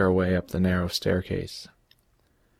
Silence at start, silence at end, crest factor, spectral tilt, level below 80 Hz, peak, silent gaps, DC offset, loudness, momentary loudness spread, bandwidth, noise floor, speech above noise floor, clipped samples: 0 s; 0.9 s; 16 dB; -6 dB/octave; -48 dBFS; -10 dBFS; none; under 0.1%; -26 LUFS; 15 LU; 15.5 kHz; -66 dBFS; 41 dB; under 0.1%